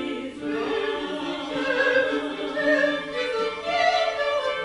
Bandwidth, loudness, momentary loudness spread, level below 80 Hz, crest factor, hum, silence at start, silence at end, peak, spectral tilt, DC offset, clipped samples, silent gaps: 11 kHz; -24 LUFS; 8 LU; -58 dBFS; 16 dB; none; 0 s; 0 s; -10 dBFS; -3.5 dB/octave; under 0.1%; under 0.1%; none